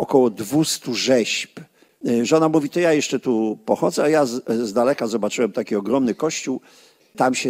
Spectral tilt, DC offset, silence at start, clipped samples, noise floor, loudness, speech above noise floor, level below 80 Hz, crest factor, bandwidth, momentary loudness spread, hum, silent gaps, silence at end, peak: -4.5 dB/octave; under 0.1%; 0 s; under 0.1%; -42 dBFS; -20 LUFS; 23 dB; -66 dBFS; 18 dB; 16 kHz; 6 LU; none; none; 0 s; -2 dBFS